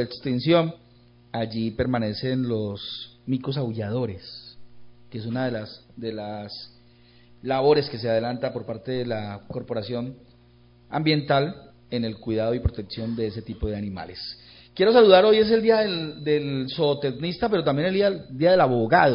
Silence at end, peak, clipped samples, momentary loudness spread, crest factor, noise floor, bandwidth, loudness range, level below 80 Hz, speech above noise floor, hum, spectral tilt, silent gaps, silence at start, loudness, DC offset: 0 s; -2 dBFS; under 0.1%; 17 LU; 22 dB; -54 dBFS; 5.4 kHz; 11 LU; -46 dBFS; 31 dB; 60 Hz at -55 dBFS; -10.5 dB/octave; none; 0 s; -24 LUFS; under 0.1%